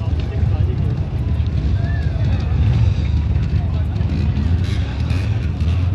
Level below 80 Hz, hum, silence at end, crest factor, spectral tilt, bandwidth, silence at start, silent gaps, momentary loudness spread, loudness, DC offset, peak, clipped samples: -24 dBFS; none; 0 s; 12 dB; -8.5 dB/octave; 6.8 kHz; 0 s; none; 4 LU; -19 LUFS; under 0.1%; -6 dBFS; under 0.1%